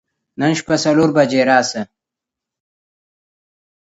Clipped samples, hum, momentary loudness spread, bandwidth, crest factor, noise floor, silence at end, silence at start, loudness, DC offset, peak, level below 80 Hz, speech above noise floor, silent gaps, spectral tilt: under 0.1%; none; 11 LU; 8 kHz; 18 dB; -84 dBFS; 2.15 s; 0.4 s; -15 LUFS; under 0.1%; 0 dBFS; -60 dBFS; 70 dB; none; -5 dB/octave